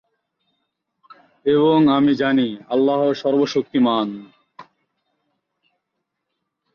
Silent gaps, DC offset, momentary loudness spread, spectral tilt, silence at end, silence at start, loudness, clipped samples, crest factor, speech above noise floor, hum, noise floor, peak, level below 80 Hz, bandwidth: none; under 0.1%; 8 LU; -7 dB/octave; 2.15 s; 1.45 s; -18 LUFS; under 0.1%; 16 dB; 60 dB; none; -78 dBFS; -6 dBFS; -64 dBFS; 6.8 kHz